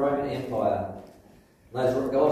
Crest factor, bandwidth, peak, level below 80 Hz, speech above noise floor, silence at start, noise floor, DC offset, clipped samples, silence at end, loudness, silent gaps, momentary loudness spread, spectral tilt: 16 dB; 15 kHz; -10 dBFS; -56 dBFS; 30 dB; 0 s; -56 dBFS; under 0.1%; under 0.1%; 0 s; -28 LUFS; none; 13 LU; -7.5 dB/octave